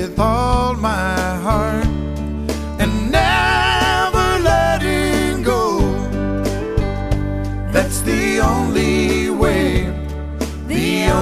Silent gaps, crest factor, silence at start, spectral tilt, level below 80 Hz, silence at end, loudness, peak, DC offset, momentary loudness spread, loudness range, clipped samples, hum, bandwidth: none; 16 dB; 0 s; -5 dB/octave; -24 dBFS; 0 s; -17 LUFS; 0 dBFS; under 0.1%; 9 LU; 3 LU; under 0.1%; none; 15.5 kHz